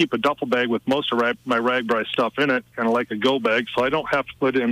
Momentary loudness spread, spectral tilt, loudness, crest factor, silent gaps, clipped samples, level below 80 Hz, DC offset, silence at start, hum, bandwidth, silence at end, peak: 2 LU; -5.5 dB/octave; -22 LUFS; 14 dB; none; under 0.1%; -58 dBFS; under 0.1%; 0 s; none; 15.5 kHz; 0 s; -6 dBFS